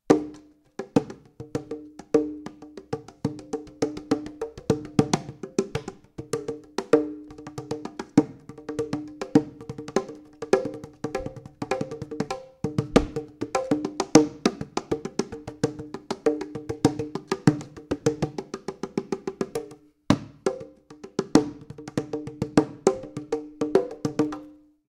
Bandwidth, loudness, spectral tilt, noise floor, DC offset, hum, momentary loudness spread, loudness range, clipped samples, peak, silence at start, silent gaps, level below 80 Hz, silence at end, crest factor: 12.5 kHz; -28 LUFS; -6 dB/octave; -49 dBFS; under 0.1%; none; 16 LU; 5 LU; under 0.1%; 0 dBFS; 0.1 s; none; -52 dBFS; 0.35 s; 28 dB